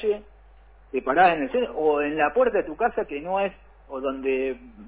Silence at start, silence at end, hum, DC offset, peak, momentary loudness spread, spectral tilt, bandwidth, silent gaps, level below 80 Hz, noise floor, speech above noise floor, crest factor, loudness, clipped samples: 0 s; 0 s; none; under 0.1%; -8 dBFS; 12 LU; -9 dB/octave; 4 kHz; none; -52 dBFS; -51 dBFS; 27 dB; 16 dB; -24 LUFS; under 0.1%